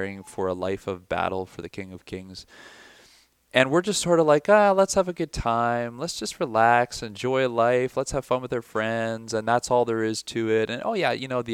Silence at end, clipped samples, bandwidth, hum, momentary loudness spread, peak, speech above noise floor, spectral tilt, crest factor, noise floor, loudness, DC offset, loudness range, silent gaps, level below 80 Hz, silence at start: 0 s; under 0.1%; 15.5 kHz; none; 14 LU; -2 dBFS; 34 dB; -4.5 dB/octave; 22 dB; -58 dBFS; -24 LUFS; under 0.1%; 6 LU; none; -50 dBFS; 0 s